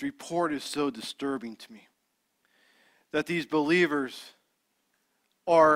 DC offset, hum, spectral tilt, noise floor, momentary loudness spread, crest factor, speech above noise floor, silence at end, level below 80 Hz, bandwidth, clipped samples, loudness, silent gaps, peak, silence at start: under 0.1%; none; -5 dB/octave; -76 dBFS; 18 LU; 20 dB; 49 dB; 0 s; -70 dBFS; 16 kHz; under 0.1%; -29 LUFS; none; -8 dBFS; 0 s